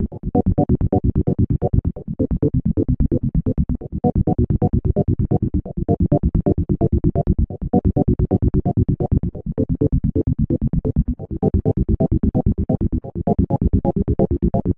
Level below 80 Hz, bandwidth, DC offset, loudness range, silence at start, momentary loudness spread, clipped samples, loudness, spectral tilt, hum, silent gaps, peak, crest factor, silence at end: -24 dBFS; 2.3 kHz; under 0.1%; 1 LU; 0 s; 4 LU; under 0.1%; -20 LUFS; -14.5 dB/octave; none; none; -2 dBFS; 16 dB; 0.05 s